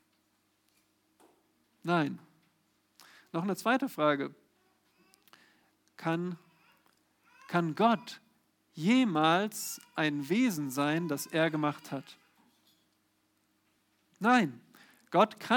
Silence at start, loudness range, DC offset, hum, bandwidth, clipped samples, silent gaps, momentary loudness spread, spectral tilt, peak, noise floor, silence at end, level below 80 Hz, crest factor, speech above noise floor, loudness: 1.85 s; 9 LU; under 0.1%; none; 19 kHz; under 0.1%; none; 15 LU; -5 dB/octave; -12 dBFS; -74 dBFS; 0 s; -88 dBFS; 22 dB; 45 dB; -31 LUFS